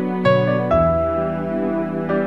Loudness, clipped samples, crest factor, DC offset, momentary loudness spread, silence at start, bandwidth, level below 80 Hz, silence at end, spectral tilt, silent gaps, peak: -19 LUFS; under 0.1%; 16 dB; 0.6%; 6 LU; 0 s; 7.2 kHz; -38 dBFS; 0 s; -9 dB/octave; none; -4 dBFS